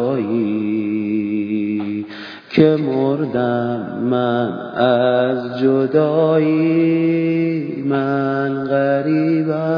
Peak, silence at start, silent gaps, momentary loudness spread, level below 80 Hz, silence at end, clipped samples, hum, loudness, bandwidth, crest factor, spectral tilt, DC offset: 0 dBFS; 0 s; none; 6 LU; -62 dBFS; 0 s; under 0.1%; none; -18 LUFS; 5.2 kHz; 16 dB; -9.5 dB/octave; under 0.1%